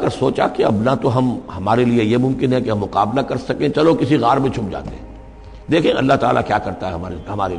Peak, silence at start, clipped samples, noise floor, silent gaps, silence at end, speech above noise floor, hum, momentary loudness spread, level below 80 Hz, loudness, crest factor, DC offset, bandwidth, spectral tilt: -4 dBFS; 0 s; under 0.1%; -37 dBFS; none; 0 s; 20 dB; none; 11 LU; -40 dBFS; -17 LUFS; 14 dB; under 0.1%; 10.5 kHz; -7.5 dB/octave